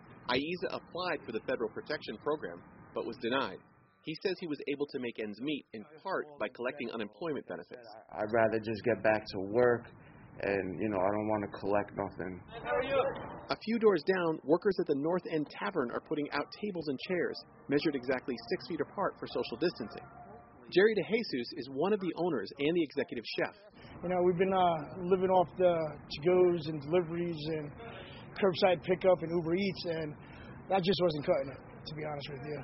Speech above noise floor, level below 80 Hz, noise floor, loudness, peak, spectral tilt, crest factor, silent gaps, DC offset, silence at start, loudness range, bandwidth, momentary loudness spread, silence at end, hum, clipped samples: 20 dB; -64 dBFS; -52 dBFS; -33 LUFS; -12 dBFS; -4.5 dB/octave; 20 dB; none; under 0.1%; 0 s; 6 LU; 5.8 kHz; 15 LU; 0 s; none; under 0.1%